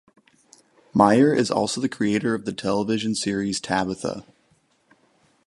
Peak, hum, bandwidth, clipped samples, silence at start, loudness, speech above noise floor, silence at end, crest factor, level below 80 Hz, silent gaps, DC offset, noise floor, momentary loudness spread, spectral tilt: -2 dBFS; none; 11.5 kHz; under 0.1%; 0.95 s; -22 LUFS; 42 dB; 1.25 s; 22 dB; -58 dBFS; none; under 0.1%; -64 dBFS; 10 LU; -5 dB/octave